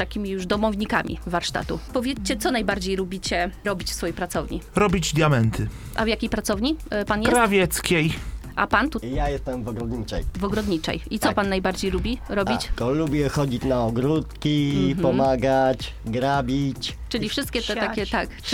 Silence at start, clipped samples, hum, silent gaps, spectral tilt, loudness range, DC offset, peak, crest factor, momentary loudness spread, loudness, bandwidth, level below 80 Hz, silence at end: 0 s; under 0.1%; none; none; -5 dB/octave; 3 LU; under 0.1%; -2 dBFS; 22 dB; 8 LU; -24 LUFS; 18.5 kHz; -36 dBFS; 0 s